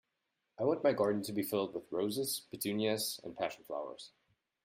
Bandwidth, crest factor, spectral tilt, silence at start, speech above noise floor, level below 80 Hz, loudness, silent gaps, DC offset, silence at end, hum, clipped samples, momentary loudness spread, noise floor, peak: 16 kHz; 18 dB; -4 dB/octave; 0.6 s; 49 dB; -78 dBFS; -36 LUFS; none; under 0.1%; 0.55 s; none; under 0.1%; 11 LU; -85 dBFS; -18 dBFS